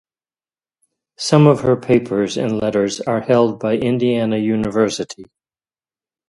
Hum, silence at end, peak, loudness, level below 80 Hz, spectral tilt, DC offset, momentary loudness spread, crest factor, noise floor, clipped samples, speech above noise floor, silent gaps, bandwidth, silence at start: none; 1.05 s; 0 dBFS; -17 LUFS; -52 dBFS; -6.5 dB/octave; under 0.1%; 8 LU; 18 dB; under -90 dBFS; under 0.1%; over 74 dB; none; 11.5 kHz; 1.2 s